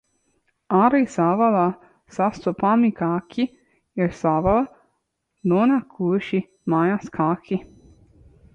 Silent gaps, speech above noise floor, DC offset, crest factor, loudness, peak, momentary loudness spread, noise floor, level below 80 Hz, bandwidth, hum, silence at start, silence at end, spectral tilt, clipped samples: none; 54 dB; under 0.1%; 18 dB; -21 LUFS; -6 dBFS; 10 LU; -74 dBFS; -50 dBFS; 8.6 kHz; none; 0.7 s; 0.9 s; -8 dB/octave; under 0.1%